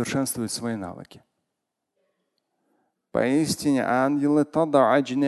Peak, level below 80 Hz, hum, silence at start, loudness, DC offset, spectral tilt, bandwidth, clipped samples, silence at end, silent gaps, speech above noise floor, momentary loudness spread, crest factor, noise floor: -6 dBFS; -60 dBFS; none; 0 s; -23 LUFS; under 0.1%; -5 dB/octave; 12.5 kHz; under 0.1%; 0 s; none; 59 dB; 11 LU; 18 dB; -82 dBFS